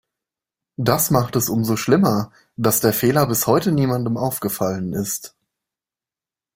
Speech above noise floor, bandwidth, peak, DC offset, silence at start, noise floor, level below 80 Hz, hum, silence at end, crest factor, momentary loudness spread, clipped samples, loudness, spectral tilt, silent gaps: over 71 dB; 16.5 kHz; -2 dBFS; under 0.1%; 0.8 s; under -90 dBFS; -52 dBFS; none; 1.25 s; 20 dB; 8 LU; under 0.1%; -19 LUFS; -5 dB/octave; none